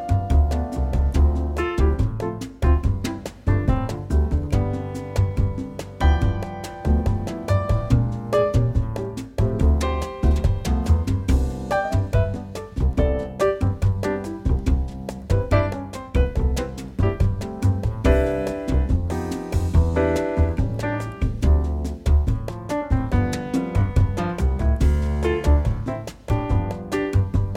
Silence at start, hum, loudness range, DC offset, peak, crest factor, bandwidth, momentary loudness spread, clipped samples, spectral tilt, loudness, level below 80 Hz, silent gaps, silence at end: 0 s; none; 2 LU; under 0.1%; -4 dBFS; 16 dB; 12.5 kHz; 7 LU; under 0.1%; -7.5 dB/octave; -23 LUFS; -24 dBFS; none; 0 s